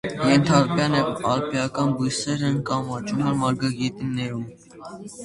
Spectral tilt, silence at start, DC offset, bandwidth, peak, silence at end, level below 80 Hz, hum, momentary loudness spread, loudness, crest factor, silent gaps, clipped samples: -5.5 dB/octave; 0.05 s; under 0.1%; 11.5 kHz; -2 dBFS; 0 s; -54 dBFS; none; 15 LU; -23 LUFS; 20 dB; none; under 0.1%